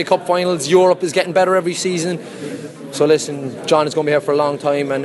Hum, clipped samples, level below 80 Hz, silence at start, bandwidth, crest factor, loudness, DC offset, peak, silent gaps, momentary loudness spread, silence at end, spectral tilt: none; under 0.1%; -64 dBFS; 0 s; 12 kHz; 16 dB; -16 LUFS; under 0.1%; -2 dBFS; none; 14 LU; 0 s; -4.5 dB/octave